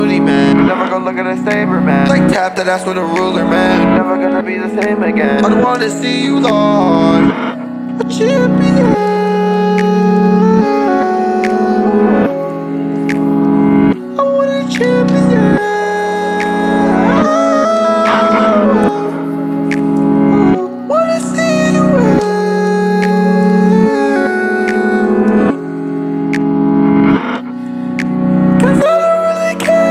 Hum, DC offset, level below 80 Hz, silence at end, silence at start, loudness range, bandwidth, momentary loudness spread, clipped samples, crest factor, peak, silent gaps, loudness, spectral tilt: none; under 0.1%; -42 dBFS; 0 s; 0 s; 2 LU; 12 kHz; 7 LU; under 0.1%; 10 dB; 0 dBFS; none; -12 LUFS; -7 dB/octave